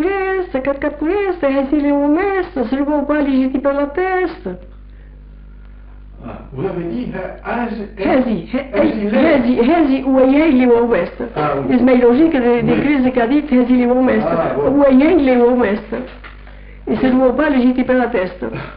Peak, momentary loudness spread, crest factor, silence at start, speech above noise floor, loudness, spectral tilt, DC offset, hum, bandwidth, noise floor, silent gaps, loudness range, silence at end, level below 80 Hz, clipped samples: -4 dBFS; 12 LU; 12 dB; 0 s; 22 dB; -15 LUFS; -5.5 dB/octave; under 0.1%; none; 5 kHz; -36 dBFS; none; 10 LU; 0 s; -38 dBFS; under 0.1%